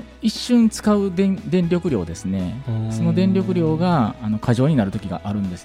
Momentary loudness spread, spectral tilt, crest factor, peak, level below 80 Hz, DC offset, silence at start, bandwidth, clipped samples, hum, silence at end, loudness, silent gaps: 8 LU; -7 dB/octave; 14 dB; -6 dBFS; -44 dBFS; under 0.1%; 0 s; 13.5 kHz; under 0.1%; none; 0 s; -20 LUFS; none